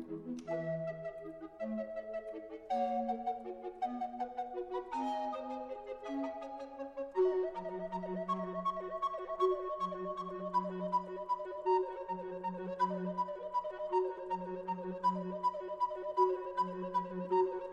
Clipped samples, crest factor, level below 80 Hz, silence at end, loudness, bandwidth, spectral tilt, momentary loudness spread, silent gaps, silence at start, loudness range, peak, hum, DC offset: under 0.1%; 18 dB; -70 dBFS; 0 s; -38 LUFS; 8.2 kHz; -7.5 dB/octave; 10 LU; none; 0 s; 4 LU; -18 dBFS; none; under 0.1%